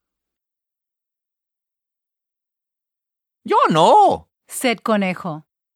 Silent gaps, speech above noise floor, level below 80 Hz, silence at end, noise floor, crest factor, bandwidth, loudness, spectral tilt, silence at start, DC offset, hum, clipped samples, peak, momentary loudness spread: none; 70 dB; -62 dBFS; 0.35 s; -86 dBFS; 20 dB; 17 kHz; -16 LUFS; -4.5 dB/octave; 3.45 s; under 0.1%; none; under 0.1%; 0 dBFS; 18 LU